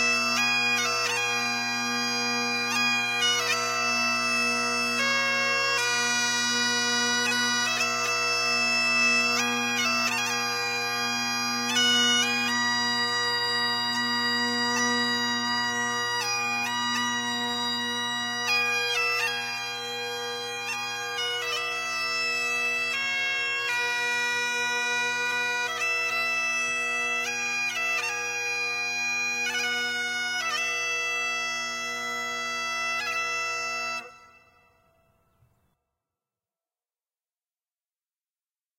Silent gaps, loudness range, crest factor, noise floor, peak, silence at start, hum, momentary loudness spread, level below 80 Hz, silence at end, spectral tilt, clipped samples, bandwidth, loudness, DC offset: none; 5 LU; 16 dB; under -90 dBFS; -12 dBFS; 0 s; none; 6 LU; -74 dBFS; 4.55 s; -0.5 dB/octave; under 0.1%; 16.5 kHz; -25 LUFS; under 0.1%